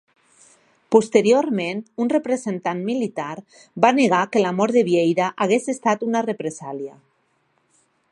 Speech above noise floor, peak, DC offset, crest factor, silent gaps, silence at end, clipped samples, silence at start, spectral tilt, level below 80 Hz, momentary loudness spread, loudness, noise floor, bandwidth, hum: 46 dB; 0 dBFS; under 0.1%; 20 dB; none; 1.2 s; under 0.1%; 0.9 s; -5.5 dB/octave; -72 dBFS; 15 LU; -20 LUFS; -66 dBFS; 11 kHz; none